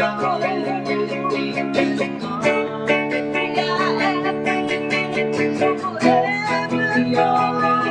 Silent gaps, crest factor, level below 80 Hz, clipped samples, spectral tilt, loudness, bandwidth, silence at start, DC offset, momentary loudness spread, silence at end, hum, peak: none; 18 dB; -62 dBFS; under 0.1%; -5.5 dB/octave; -20 LUFS; 10.5 kHz; 0 s; under 0.1%; 5 LU; 0 s; none; -2 dBFS